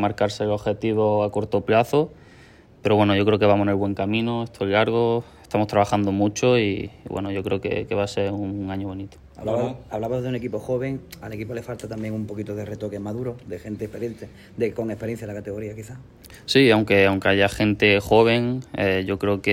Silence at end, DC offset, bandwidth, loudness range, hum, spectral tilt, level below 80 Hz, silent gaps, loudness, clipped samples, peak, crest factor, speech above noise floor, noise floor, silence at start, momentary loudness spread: 0 s; under 0.1%; 16 kHz; 11 LU; none; -6 dB/octave; -50 dBFS; none; -22 LUFS; under 0.1%; -4 dBFS; 18 dB; 27 dB; -49 dBFS; 0 s; 15 LU